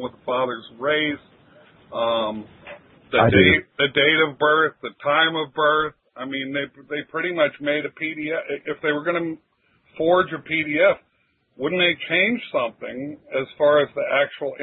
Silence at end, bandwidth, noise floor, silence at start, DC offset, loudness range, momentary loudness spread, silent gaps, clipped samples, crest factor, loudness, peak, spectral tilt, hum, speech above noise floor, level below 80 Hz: 0 s; 4.1 kHz; -64 dBFS; 0 s; under 0.1%; 6 LU; 13 LU; none; under 0.1%; 22 dB; -21 LUFS; 0 dBFS; -10 dB/octave; none; 43 dB; -54 dBFS